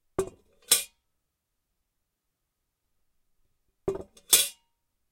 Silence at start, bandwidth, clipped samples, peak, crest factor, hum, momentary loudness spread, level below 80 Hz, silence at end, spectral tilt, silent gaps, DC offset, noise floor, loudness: 0.2 s; 16.5 kHz; under 0.1%; -6 dBFS; 28 dB; none; 18 LU; -60 dBFS; 0.6 s; -0.5 dB/octave; none; under 0.1%; -81 dBFS; -25 LUFS